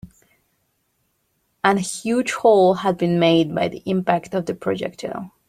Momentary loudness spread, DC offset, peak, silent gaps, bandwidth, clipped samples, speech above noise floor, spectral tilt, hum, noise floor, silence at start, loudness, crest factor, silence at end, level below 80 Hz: 11 LU; under 0.1%; -2 dBFS; none; 14.5 kHz; under 0.1%; 50 dB; -5.5 dB/octave; none; -69 dBFS; 0.05 s; -20 LUFS; 20 dB; 0.2 s; -60 dBFS